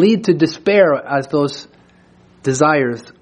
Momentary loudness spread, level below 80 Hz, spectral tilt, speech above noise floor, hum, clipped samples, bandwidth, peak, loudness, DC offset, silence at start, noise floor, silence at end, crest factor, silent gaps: 9 LU; -58 dBFS; -5.5 dB/octave; 34 dB; none; under 0.1%; 10 kHz; -2 dBFS; -16 LUFS; under 0.1%; 0 s; -49 dBFS; 0.2 s; 14 dB; none